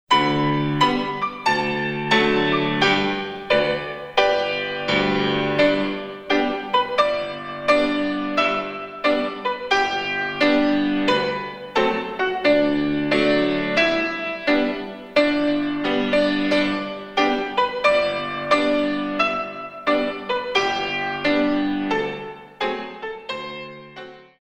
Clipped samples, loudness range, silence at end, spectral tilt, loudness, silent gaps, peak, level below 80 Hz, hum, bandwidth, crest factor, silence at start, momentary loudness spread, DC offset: under 0.1%; 2 LU; 0.2 s; -5 dB/octave; -21 LUFS; none; -2 dBFS; -50 dBFS; none; 9.6 kHz; 18 dB; 0.1 s; 9 LU; under 0.1%